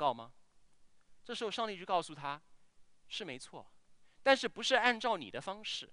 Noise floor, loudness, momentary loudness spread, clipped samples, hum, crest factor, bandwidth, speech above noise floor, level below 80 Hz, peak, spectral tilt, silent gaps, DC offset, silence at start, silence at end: -62 dBFS; -35 LUFS; 17 LU; under 0.1%; none; 24 dB; 10.5 kHz; 26 dB; -74 dBFS; -12 dBFS; -2.5 dB/octave; none; under 0.1%; 0 s; 0 s